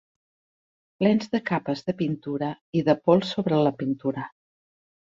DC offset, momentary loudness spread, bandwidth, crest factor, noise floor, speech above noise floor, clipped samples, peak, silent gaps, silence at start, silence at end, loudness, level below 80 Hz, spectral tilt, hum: under 0.1%; 9 LU; 7.6 kHz; 22 dB; under -90 dBFS; over 66 dB; under 0.1%; -4 dBFS; 2.61-2.73 s; 1 s; 0.85 s; -25 LUFS; -66 dBFS; -7.5 dB/octave; none